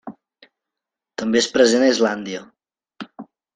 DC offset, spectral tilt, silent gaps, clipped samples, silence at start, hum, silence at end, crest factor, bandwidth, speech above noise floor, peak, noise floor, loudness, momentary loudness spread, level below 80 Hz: under 0.1%; -3 dB/octave; none; under 0.1%; 0.05 s; none; 0.35 s; 20 dB; 9.8 kHz; 68 dB; -2 dBFS; -86 dBFS; -18 LUFS; 23 LU; -64 dBFS